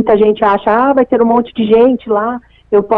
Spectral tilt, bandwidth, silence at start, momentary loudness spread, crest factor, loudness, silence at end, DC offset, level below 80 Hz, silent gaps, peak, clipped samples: -9 dB/octave; 4.4 kHz; 0 s; 6 LU; 10 dB; -11 LUFS; 0 s; under 0.1%; -44 dBFS; none; 0 dBFS; under 0.1%